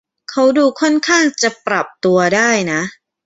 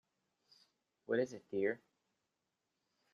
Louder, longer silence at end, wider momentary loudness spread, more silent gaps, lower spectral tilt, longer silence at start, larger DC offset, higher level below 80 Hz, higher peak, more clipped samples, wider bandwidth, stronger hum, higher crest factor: first, -14 LUFS vs -39 LUFS; second, 0.35 s vs 1.35 s; second, 7 LU vs 11 LU; neither; second, -3.5 dB/octave vs -6 dB/octave; second, 0.3 s vs 1.1 s; neither; first, -58 dBFS vs -86 dBFS; first, -2 dBFS vs -22 dBFS; neither; about the same, 8 kHz vs 7.6 kHz; neither; second, 14 dB vs 20 dB